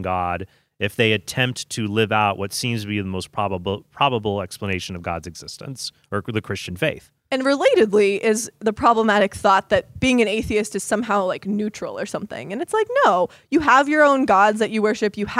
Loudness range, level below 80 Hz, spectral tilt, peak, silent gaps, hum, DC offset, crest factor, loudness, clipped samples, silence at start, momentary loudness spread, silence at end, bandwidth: 7 LU; -50 dBFS; -4.5 dB/octave; -2 dBFS; none; none; under 0.1%; 18 dB; -20 LUFS; under 0.1%; 0 s; 13 LU; 0 s; 15.5 kHz